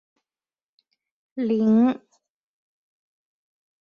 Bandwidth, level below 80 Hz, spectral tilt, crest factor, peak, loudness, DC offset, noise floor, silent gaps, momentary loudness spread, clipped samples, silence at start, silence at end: 5 kHz; -72 dBFS; -9 dB/octave; 16 dB; -10 dBFS; -21 LUFS; under 0.1%; under -90 dBFS; none; 17 LU; under 0.1%; 1.35 s; 1.85 s